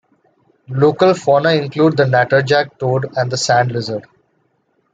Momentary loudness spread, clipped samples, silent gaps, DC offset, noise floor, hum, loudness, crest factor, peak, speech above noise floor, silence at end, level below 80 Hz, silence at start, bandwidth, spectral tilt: 9 LU; under 0.1%; none; under 0.1%; -63 dBFS; none; -15 LUFS; 14 dB; -2 dBFS; 49 dB; 0.9 s; -58 dBFS; 0.7 s; 9.2 kHz; -5.5 dB/octave